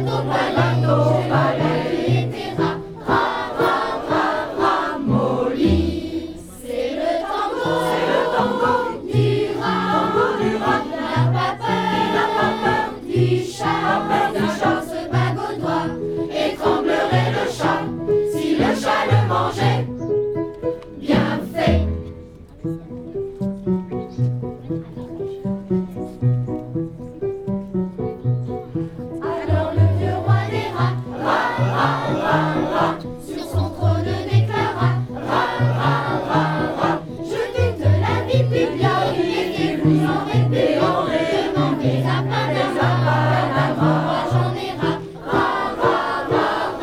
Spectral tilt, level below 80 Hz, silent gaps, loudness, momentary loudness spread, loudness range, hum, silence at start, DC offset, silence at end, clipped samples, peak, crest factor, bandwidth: -7 dB/octave; -42 dBFS; none; -20 LUFS; 9 LU; 6 LU; none; 0 s; under 0.1%; 0 s; under 0.1%; -2 dBFS; 16 dB; 14.5 kHz